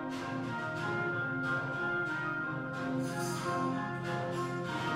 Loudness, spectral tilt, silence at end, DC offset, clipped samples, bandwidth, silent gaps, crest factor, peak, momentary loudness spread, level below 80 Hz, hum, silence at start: -35 LUFS; -5.5 dB/octave; 0 s; under 0.1%; under 0.1%; 16 kHz; none; 14 dB; -22 dBFS; 3 LU; -68 dBFS; none; 0 s